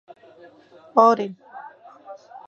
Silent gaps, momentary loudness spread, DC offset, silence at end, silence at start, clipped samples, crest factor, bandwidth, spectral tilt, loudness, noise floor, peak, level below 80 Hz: none; 27 LU; under 0.1%; 0.1 s; 0.95 s; under 0.1%; 22 dB; 7.8 kHz; -6 dB/octave; -19 LUFS; -50 dBFS; -2 dBFS; -84 dBFS